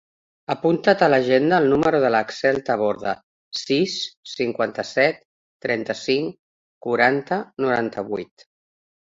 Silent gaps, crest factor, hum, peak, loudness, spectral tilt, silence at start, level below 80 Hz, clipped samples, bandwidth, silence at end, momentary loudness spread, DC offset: 3.23-3.52 s, 4.17-4.23 s, 5.25-5.60 s, 6.39-6.81 s; 20 dB; none; -2 dBFS; -21 LUFS; -5 dB/octave; 0.5 s; -60 dBFS; under 0.1%; 7.8 kHz; 0.9 s; 14 LU; under 0.1%